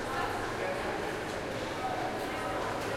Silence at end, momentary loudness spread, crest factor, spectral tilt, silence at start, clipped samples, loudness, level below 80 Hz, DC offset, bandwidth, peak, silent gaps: 0 s; 2 LU; 14 dB; -4.5 dB/octave; 0 s; under 0.1%; -34 LUFS; -52 dBFS; under 0.1%; 16.5 kHz; -22 dBFS; none